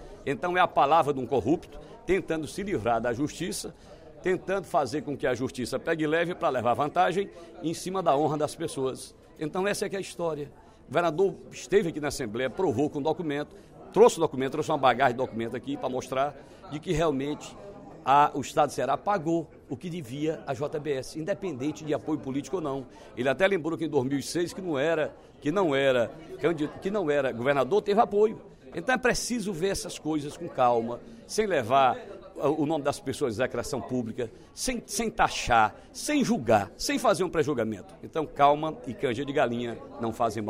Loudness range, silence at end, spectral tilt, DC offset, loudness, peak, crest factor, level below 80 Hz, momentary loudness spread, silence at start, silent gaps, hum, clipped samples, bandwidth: 4 LU; 0 s; -5 dB/octave; under 0.1%; -28 LUFS; -6 dBFS; 22 dB; -52 dBFS; 12 LU; 0 s; none; none; under 0.1%; 16 kHz